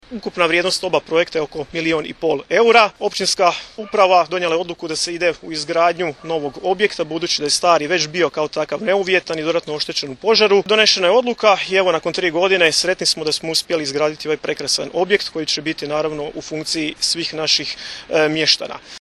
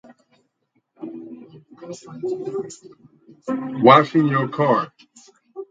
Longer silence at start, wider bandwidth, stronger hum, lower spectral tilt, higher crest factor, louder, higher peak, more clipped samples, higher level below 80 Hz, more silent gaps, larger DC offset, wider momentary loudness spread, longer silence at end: second, 0.1 s vs 1 s; first, 13.5 kHz vs 9.2 kHz; neither; second, -2.5 dB/octave vs -6.5 dB/octave; about the same, 18 dB vs 22 dB; about the same, -17 LUFS vs -19 LUFS; about the same, 0 dBFS vs 0 dBFS; neither; first, -54 dBFS vs -68 dBFS; neither; neither; second, 9 LU vs 27 LU; about the same, 0 s vs 0.05 s